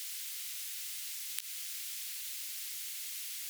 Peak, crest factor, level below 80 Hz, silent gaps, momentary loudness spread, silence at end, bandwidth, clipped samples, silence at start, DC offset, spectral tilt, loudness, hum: -10 dBFS; 32 dB; under -90 dBFS; none; 0 LU; 0 s; over 20 kHz; under 0.1%; 0 s; under 0.1%; 10 dB/octave; -38 LUFS; none